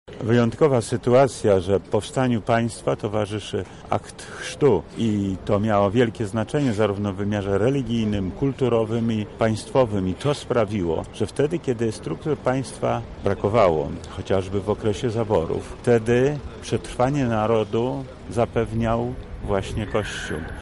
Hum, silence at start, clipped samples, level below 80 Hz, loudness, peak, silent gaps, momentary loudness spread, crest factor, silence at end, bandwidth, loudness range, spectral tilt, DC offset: none; 0.05 s; under 0.1%; -42 dBFS; -23 LUFS; -6 dBFS; none; 9 LU; 16 dB; 0 s; 11.5 kHz; 2 LU; -6.5 dB/octave; 0.2%